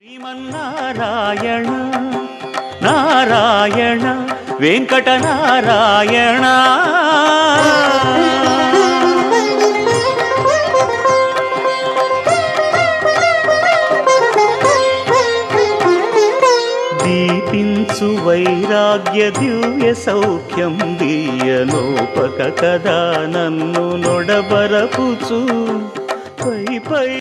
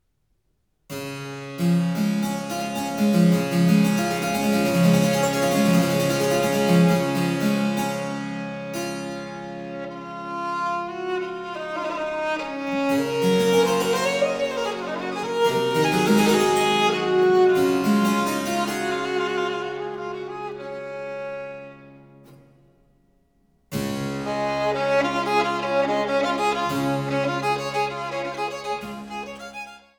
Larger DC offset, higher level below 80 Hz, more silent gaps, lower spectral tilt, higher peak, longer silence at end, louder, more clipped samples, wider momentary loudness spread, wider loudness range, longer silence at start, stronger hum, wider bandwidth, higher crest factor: neither; about the same, -56 dBFS vs -58 dBFS; neither; about the same, -4.5 dB/octave vs -5.5 dB/octave; first, 0 dBFS vs -6 dBFS; second, 0 s vs 0.2 s; first, -14 LUFS vs -23 LUFS; neither; second, 8 LU vs 14 LU; second, 5 LU vs 10 LU; second, 0.1 s vs 0.9 s; neither; second, 13 kHz vs over 20 kHz; about the same, 14 dB vs 16 dB